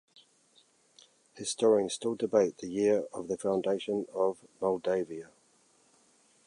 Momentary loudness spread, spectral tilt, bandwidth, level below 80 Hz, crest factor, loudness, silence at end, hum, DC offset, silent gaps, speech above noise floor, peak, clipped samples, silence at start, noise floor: 10 LU; -4.5 dB/octave; 11 kHz; -74 dBFS; 20 dB; -31 LUFS; 1.2 s; none; under 0.1%; none; 37 dB; -12 dBFS; under 0.1%; 1.35 s; -67 dBFS